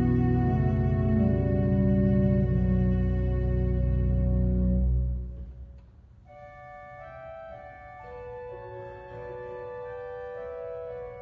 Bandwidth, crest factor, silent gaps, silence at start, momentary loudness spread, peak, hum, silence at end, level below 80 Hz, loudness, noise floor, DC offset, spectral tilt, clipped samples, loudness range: 3.5 kHz; 14 dB; none; 0 s; 20 LU; -12 dBFS; none; 0 s; -32 dBFS; -27 LUFS; -52 dBFS; under 0.1%; -12 dB/octave; under 0.1%; 18 LU